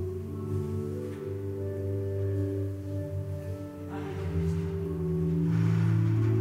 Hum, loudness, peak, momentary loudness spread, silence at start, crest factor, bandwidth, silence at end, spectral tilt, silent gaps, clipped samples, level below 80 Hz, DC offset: none; -31 LUFS; -16 dBFS; 10 LU; 0 s; 14 dB; 11 kHz; 0 s; -9.5 dB/octave; none; under 0.1%; -50 dBFS; under 0.1%